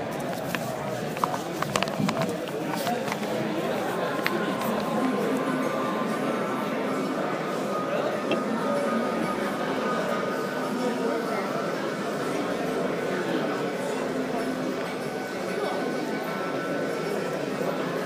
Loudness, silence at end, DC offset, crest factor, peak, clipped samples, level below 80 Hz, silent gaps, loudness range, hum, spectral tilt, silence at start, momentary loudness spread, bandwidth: -28 LUFS; 0 s; under 0.1%; 24 dB; -4 dBFS; under 0.1%; -64 dBFS; none; 2 LU; none; -5 dB/octave; 0 s; 4 LU; 15.5 kHz